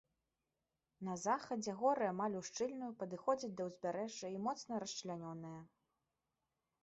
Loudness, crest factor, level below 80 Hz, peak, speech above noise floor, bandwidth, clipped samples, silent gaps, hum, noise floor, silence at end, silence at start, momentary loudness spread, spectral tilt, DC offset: -42 LUFS; 20 dB; -82 dBFS; -22 dBFS; over 49 dB; 8 kHz; under 0.1%; none; none; under -90 dBFS; 1.15 s; 1 s; 10 LU; -4.5 dB/octave; under 0.1%